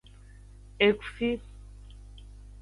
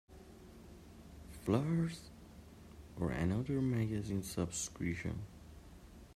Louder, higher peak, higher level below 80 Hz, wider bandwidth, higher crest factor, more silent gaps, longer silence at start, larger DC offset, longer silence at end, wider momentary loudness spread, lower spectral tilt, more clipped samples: first, -28 LUFS vs -38 LUFS; first, -8 dBFS vs -20 dBFS; first, -48 dBFS vs -58 dBFS; second, 11 kHz vs 15.5 kHz; about the same, 24 dB vs 20 dB; neither; first, 0.8 s vs 0.1 s; neither; first, 0.35 s vs 0 s; first, 26 LU vs 21 LU; about the same, -6 dB/octave vs -6 dB/octave; neither